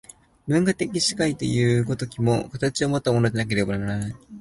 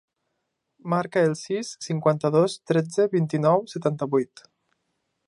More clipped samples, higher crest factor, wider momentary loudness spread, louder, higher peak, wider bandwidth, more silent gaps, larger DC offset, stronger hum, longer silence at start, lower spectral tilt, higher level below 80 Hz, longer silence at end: neither; about the same, 16 dB vs 20 dB; second, 6 LU vs 9 LU; about the same, -23 LUFS vs -24 LUFS; about the same, -8 dBFS vs -6 dBFS; about the same, 11.5 kHz vs 11.5 kHz; neither; neither; neither; second, 0.45 s vs 0.85 s; about the same, -5.5 dB/octave vs -6.5 dB/octave; first, -50 dBFS vs -72 dBFS; second, 0 s vs 1 s